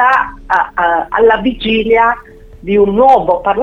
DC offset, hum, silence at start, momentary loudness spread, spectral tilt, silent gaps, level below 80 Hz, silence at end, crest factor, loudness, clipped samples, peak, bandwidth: under 0.1%; none; 0 s; 6 LU; -6.5 dB/octave; none; -36 dBFS; 0 s; 12 dB; -11 LUFS; under 0.1%; 0 dBFS; 7.2 kHz